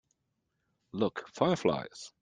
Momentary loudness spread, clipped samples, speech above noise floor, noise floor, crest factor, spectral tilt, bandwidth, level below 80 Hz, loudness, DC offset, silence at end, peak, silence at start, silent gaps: 14 LU; under 0.1%; 49 dB; -81 dBFS; 24 dB; -6 dB/octave; 9.6 kHz; -68 dBFS; -32 LUFS; under 0.1%; 0.15 s; -10 dBFS; 0.95 s; none